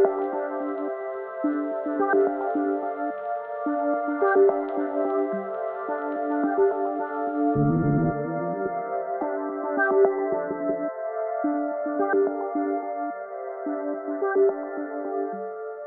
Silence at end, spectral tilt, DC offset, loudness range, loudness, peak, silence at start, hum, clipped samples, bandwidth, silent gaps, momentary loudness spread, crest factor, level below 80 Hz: 0 s; -9 dB/octave; under 0.1%; 3 LU; -26 LUFS; -6 dBFS; 0 s; none; under 0.1%; 2.9 kHz; none; 9 LU; 18 dB; -56 dBFS